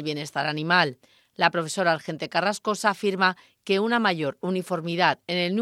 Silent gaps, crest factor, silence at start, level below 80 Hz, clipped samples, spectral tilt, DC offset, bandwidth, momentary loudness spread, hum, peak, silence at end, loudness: none; 22 dB; 0 s; -76 dBFS; under 0.1%; -4.5 dB/octave; under 0.1%; 15 kHz; 7 LU; none; -2 dBFS; 0 s; -24 LUFS